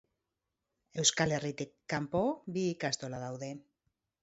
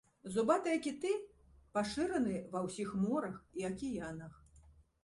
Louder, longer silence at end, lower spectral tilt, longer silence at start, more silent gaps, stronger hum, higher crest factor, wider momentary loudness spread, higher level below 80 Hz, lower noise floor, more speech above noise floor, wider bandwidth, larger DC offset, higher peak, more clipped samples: first, -33 LUFS vs -37 LUFS; first, 0.6 s vs 0.35 s; second, -4 dB/octave vs -5.5 dB/octave; first, 0.95 s vs 0.25 s; neither; neither; about the same, 24 dB vs 20 dB; first, 15 LU vs 11 LU; about the same, -66 dBFS vs -64 dBFS; first, -87 dBFS vs -64 dBFS; first, 53 dB vs 27 dB; second, 8 kHz vs 11.5 kHz; neither; first, -12 dBFS vs -18 dBFS; neither